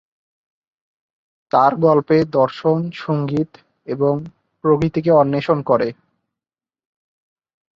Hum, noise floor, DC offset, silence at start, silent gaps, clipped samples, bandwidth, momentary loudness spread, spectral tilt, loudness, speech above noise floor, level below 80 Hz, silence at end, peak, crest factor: none; under -90 dBFS; under 0.1%; 1.55 s; none; under 0.1%; 7.2 kHz; 9 LU; -9 dB/octave; -18 LUFS; over 73 dB; -56 dBFS; 1.85 s; -2 dBFS; 18 dB